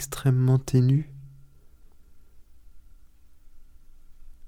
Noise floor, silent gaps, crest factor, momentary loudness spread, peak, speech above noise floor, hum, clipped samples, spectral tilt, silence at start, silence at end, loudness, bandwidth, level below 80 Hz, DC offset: -50 dBFS; none; 18 dB; 18 LU; -10 dBFS; 28 dB; none; under 0.1%; -7.5 dB/octave; 0 s; 0 s; -23 LUFS; 16 kHz; -50 dBFS; under 0.1%